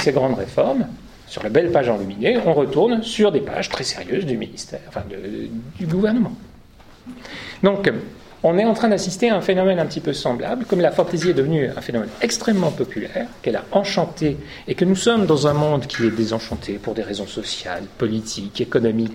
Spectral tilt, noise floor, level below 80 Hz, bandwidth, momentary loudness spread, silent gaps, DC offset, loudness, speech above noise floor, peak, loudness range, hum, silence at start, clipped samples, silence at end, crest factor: -5.5 dB/octave; -45 dBFS; -48 dBFS; 15.5 kHz; 13 LU; none; under 0.1%; -20 LUFS; 25 dB; -2 dBFS; 5 LU; none; 0 s; under 0.1%; 0 s; 20 dB